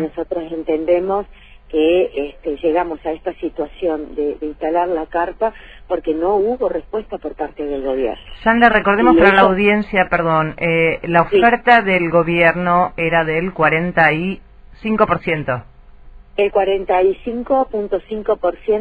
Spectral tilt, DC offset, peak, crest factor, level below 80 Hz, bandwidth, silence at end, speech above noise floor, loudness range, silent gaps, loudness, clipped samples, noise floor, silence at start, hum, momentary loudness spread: -8 dB/octave; under 0.1%; 0 dBFS; 16 dB; -40 dBFS; 9 kHz; 0 s; 23 dB; 7 LU; none; -17 LUFS; under 0.1%; -40 dBFS; 0 s; none; 12 LU